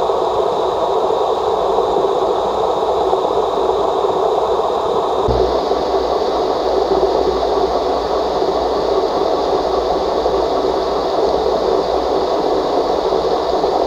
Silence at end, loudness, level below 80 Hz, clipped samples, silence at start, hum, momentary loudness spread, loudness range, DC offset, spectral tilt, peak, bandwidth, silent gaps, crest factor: 0 s; -16 LUFS; -36 dBFS; under 0.1%; 0 s; none; 1 LU; 0 LU; under 0.1%; -5.5 dB/octave; 0 dBFS; 11.5 kHz; none; 14 dB